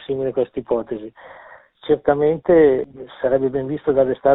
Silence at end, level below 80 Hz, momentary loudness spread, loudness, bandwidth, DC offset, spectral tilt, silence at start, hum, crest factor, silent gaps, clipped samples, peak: 0 s; -50 dBFS; 17 LU; -19 LUFS; 4 kHz; under 0.1%; -6.5 dB/octave; 0 s; none; 18 dB; none; under 0.1%; -2 dBFS